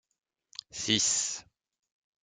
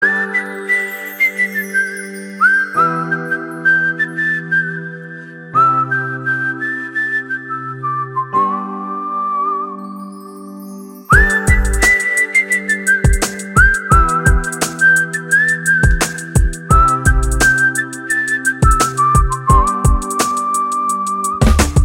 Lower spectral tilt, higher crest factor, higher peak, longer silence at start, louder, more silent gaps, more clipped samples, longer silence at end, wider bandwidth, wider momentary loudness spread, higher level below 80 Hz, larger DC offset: second, -1 dB/octave vs -4.5 dB/octave; first, 24 dB vs 14 dB; second, -12 dBFS vs 0 dBFS; first, 0.75 s vs 0 s; second, -27 LUFS vs -14 LUFS; neither; neither; first, 0.85 s vs 0 s; second, 11 kHz vs 17 kHz; first, 21 LU vs 12 LU; second, -68 dBFS vs -22 dBFS; neither